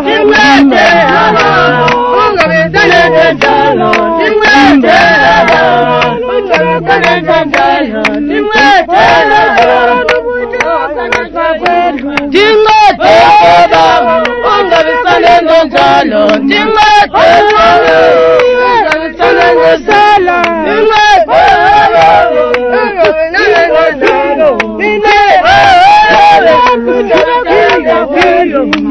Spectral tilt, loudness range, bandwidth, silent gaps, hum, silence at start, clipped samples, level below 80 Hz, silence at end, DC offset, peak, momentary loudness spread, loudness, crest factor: -4.5 dB/octave; 3 LU; 11 kHz; none; none; 0 s; 3%; -34 dBFS; 0 s; under 0.1%; 0 dBFS; 6 LU; -6 LUFS; 6 dB